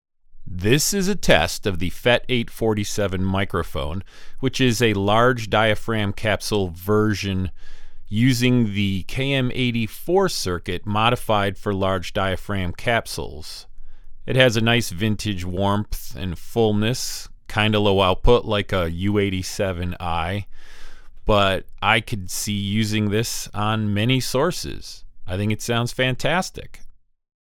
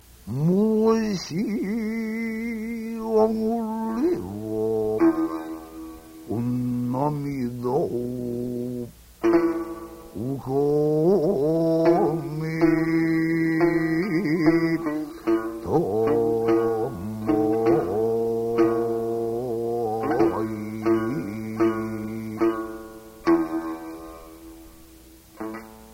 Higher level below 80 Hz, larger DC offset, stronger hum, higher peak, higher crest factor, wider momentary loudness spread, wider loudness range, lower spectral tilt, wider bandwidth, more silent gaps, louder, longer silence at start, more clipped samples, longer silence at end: first, -36 dBFS vs -52 dBFS; neither; neither; first, 0 dBFS vs -6 dBFS; about the same, 22 dB vs 18 dB; about the same, 13 LU vs 14 LU; second, 3 LU vs 6 LU; second, -5 dB/octave vs -8 dB/octave; first, 18 kHz vs 16 kHz; neither; first, -21 LUFS vs -24 LUFS; about the same, 0.3 s vs 0.25 s; neither; first, 0.55 s vs 0 s